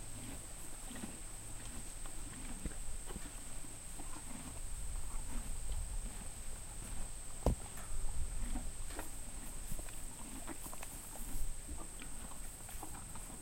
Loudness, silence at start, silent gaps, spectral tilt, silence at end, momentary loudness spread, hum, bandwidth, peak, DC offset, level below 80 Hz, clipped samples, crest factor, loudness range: -46 LUFS; 0 s; none; -3.5 dB/octave; 0 s; 3 LU; none; 16.5 kHz; -16 dBFS; under 0.1%; -44 dBFS; under 0.1%; 24 dB; 3 LU